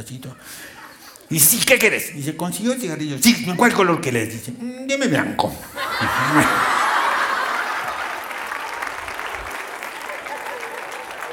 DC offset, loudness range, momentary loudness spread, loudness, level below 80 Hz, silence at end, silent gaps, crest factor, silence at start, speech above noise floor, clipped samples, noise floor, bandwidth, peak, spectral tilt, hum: under 0.1%; 9 LU; 16 LU; -20 LUFS; -52 dBFS; 0 s; none; 20 dB; 0 s; 22 dB; under 0.1%; -42 dBFS; 19.5 kHz; 0 dBFS; -3 dB/octave; none